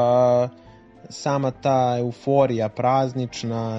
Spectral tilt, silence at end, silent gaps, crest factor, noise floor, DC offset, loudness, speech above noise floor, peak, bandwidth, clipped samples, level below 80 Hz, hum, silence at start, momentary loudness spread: -7 dB/octave; 0 s; none; 16 dB; -47 dBFS; under 0.1%; -22 LUFS; 26 dB; -6 dBFS; 8 kHz; under 0.1%; -58 dBFS; none; 0 s; 9 LU